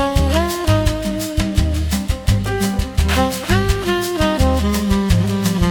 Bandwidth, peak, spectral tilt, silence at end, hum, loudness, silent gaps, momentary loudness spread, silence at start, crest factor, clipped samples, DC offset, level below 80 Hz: 18 kHz; -2 dBFS; -5.5 dB/octave; 0 s; none; -18 LUFS; none; 4 LU; 0 s; 14 dB; under 0.1%; under 0.1%; -22 dBFS